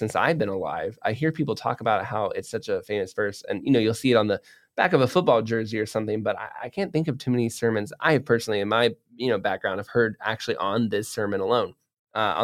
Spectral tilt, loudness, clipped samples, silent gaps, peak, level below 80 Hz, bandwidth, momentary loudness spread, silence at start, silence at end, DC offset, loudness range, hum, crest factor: -5.5 dB/octave; -25 LUFS; under 0.1%; 11.99-12.07 s; -6 dBFS; -64 dBFS; 15.5 kHz; 8 LU; 0 s; 0 s; under 0.1%; 3 LU; none; 18 dB